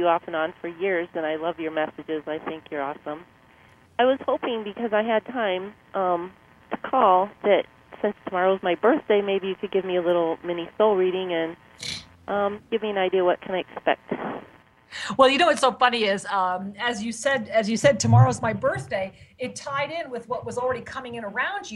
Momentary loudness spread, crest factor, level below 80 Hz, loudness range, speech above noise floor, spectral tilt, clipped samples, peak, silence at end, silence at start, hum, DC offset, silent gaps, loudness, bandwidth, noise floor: 13 LU; 22 dB; -60 dBFS; 6 LU; 31 dB; -5.5 dB/octave; under 0.1%; -4 dBFS; 0 s; 0 s; none; under 0.1%; none; -24 LUFS; 12 kHz; -54 dBFS